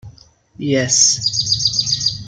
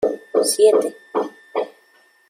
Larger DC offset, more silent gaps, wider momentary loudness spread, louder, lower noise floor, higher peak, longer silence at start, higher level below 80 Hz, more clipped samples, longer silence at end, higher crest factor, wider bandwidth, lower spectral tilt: neither; neither; second, 8 LU vs 12 LU; first, -14 LUFS vs -19 LUFS; second, -46 dBFS vs -56 dBFS; first, 0 dBFS vs -4 dBFS; about the same, 0.05 s vs 0 s; first, -48 dBFS vs -68 dBFS; neither; second, 0 s vs 0.6 s; about the same, 18 dB vs 16 dB; second, 12 kHz vs 16 kHz; about the same, -2 dB/octave vs -2 dB/octave